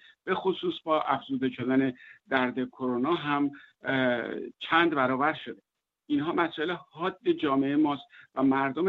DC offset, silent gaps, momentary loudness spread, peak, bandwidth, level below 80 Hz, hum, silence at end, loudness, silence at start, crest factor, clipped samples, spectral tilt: under 0.1%; none; 11 LU; -10 dBFS; 4.8 kHz; -70 dBFS; none; 0 s; -28 LUFS; 0.25 s; 20 dB; under 0.1%; -8 dB/octave